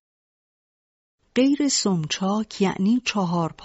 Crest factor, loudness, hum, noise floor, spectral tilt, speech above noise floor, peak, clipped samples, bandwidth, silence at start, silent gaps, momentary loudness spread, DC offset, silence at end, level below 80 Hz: 16 dB; -22 LUFS; none; under -90 dBFS; -5 dB/octave; over 68 dB; -8 dBFS; under 0.1%; 8 kHz; 1.35 s; none; 5 LU; under 0.1%; 0 s; -62 dBFS